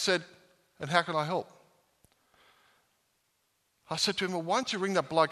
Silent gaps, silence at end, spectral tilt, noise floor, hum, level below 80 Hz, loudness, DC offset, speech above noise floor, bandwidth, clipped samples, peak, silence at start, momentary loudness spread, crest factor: none; 0 s; -3.5 dB/octave; -75 dBFS; none; -74 dBFS; -30 LUFS; under 0.1%; 46 dB; 13.5 kHz; under 0.1%; -8 dBFS; 0 s; 9 LU; 24 dB